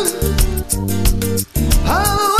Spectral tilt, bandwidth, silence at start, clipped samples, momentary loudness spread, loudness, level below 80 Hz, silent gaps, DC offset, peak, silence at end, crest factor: -4 dB/octave; 14.5 kHz; 0 s; under 0.1%; 4 LU; -17 LUFS; -20 dBFS; none; under 0.1%; 0 dBFS; 0 s; 16 dB